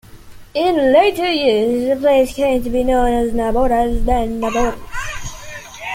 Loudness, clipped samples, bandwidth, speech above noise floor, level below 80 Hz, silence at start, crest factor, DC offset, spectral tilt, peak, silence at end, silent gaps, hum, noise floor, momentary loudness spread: -16 LUFS; under 0.1%; 16.5 kHz; 22 dB; -28 dBFS; 0.15 s; 14 dB; under 0.1%; -5 dB/octave; -2 dBFS; 0 s; none; none; -37 dBFS; 14 LU